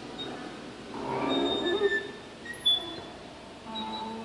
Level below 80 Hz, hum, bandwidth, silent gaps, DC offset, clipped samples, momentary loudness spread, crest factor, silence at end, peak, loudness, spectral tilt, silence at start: -60 dBFS; none; 11.5 kHz; none; under 0.1%; under 0.1%; 18 LU; 18 dB; 0 s; -14 dBFS; -30 LUFS; -4 dB/octave; 0 s